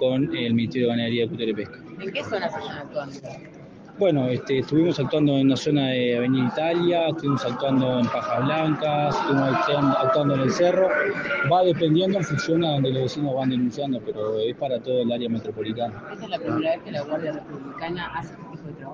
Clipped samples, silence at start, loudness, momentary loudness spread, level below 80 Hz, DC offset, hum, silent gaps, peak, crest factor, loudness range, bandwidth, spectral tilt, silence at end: under 0.1%; 0 s; -23 LUFS; 12 LU; -60 dBFS; under 0.1%; none; none; -8 dBFS; 14 dB; 7 LU; 7.6 kHz; -6.5 dB/octave; 0 s